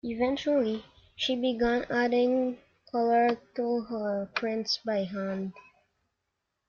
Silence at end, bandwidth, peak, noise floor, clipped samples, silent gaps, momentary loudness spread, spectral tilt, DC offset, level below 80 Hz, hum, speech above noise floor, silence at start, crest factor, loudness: 1.1 s; 7.2 kHz; -14 dBFS; -82 dBFS; under 0.1%; none; 9 LU; -5 dB/octave; under 0.1%; -60 dBFS; none; 54 dB; 0.05 s; 16 dB; -29 LUFS